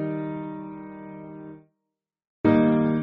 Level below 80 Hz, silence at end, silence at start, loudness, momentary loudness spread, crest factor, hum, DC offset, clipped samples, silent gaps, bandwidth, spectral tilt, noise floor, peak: -56 dBFS; 0 s; 0 s; -23 LUFS; 21 LU; 20 dB; none; under 0.1%; under 0.1%; 2.27-2.44 s; 4.4 kHz; -8 dB/octave; -84 dBFS; -8 dBFS